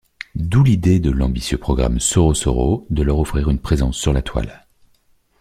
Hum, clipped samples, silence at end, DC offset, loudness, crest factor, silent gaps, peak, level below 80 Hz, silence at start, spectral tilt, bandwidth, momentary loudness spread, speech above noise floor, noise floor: none; under 0.1%; 0.85 s; under 0.1%; -18 LUFS; 16 dB; none; -2 dBFS; -24 dBFS; 0.35 s; -6 dB/octave; 15 kHz; 9 LU; 41 dB; -58 dBFS